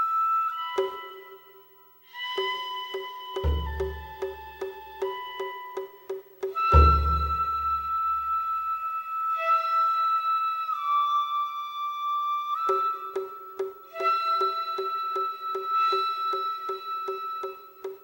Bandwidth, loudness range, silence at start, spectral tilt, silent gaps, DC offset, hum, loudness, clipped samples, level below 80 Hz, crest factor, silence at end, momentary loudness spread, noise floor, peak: 16.5 kHz; 8 LU; 0 s; -6.5 dB/octave; none; under 0.1%; none; -27 LUFS; under 0.1%; -36 dBFS; 22 dB; 0.05 s; 14 LU; -55 dBFS; -6 dBFS